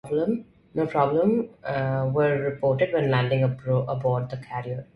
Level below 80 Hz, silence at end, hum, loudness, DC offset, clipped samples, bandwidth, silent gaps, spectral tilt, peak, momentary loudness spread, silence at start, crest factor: -58 dBFS; 0.1 s; none; -25 LUFS; under 0.1%; under 0.1%; 10.5 kHz; none; -9 dB/octave; -8 dBFS; 10 LU; 0.05 s; 16 dB